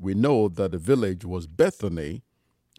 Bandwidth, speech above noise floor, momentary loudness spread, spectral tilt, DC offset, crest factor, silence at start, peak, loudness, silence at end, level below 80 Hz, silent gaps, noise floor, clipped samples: 14.5 kHz; 39 dB; 12 LU; -7.5 dB/octave; under 0.1%; 18 dB; 0 s; -8 dBFS; -24 LUFS; 0.6 s; -50 dBFS; none; -63 dBFS; under 0.1%